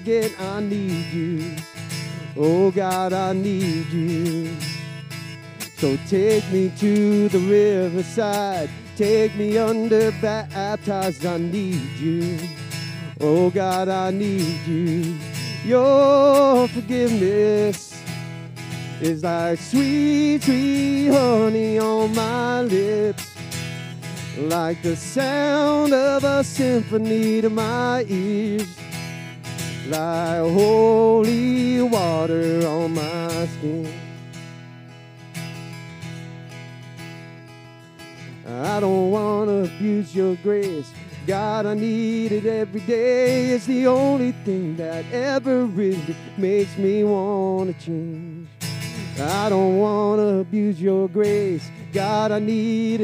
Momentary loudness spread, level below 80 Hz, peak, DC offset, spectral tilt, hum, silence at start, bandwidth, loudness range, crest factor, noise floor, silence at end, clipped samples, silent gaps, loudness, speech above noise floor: 15 LU; -70 dBFS; -4 dBFS; under 0.1%; -6 dB/octave; none; 0 s; 16 kHz; 6 LU; 16 dB; -43 dBFS; 0 s; under 0.1%; none; -21 LUFS; 23 dB